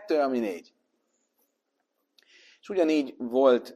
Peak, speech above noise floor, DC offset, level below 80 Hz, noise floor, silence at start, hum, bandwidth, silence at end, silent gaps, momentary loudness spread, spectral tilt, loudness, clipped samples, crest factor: -10 dBFS; 53 dB; under 0.1%; -80 dBFS; -78 dBFS; 0 s; none; 13.5 kHz; 0 s; none; 11 LU; -5 dB/octave; -26 LUFS; under 0.1%; 20 dB